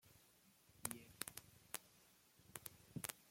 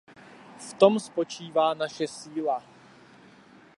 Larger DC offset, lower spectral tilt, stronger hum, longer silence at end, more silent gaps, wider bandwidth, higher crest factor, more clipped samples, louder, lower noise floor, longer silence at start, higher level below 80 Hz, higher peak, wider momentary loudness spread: neither; second, -2.5 dB/octave vs -4.5 dB/octave; neither; second, 0 s vs 1.2 s; neither; first, 16.5 kHz vs 11.5 kHz; first, 36 dB vs 24 dB; neither; second, -52 LUFS vs -26 LUFS; first, -73 dBFS vs -54 dBFS; second, 0.05 s vs 0.6 s; about the same, -80 dBFS vs -78 dBFS; second, -20 dBFS vs -4 dBFS; first, 19 LU vs 12 LU